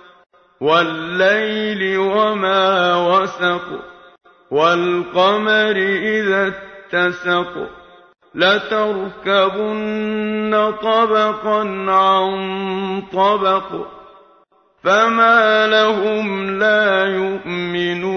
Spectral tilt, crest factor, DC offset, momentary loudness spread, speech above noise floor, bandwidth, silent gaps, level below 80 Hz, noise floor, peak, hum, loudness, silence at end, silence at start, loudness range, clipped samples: -5 dB/octave; 16 dB; under 0.1%; 9 LU; 38 dB; 6.6 kHz; none; -58 dBFS; -55 dBFS; 0 dBFS; none; -16 LUFS; 0 s; 0.6 s; 4 LU; under 0.1%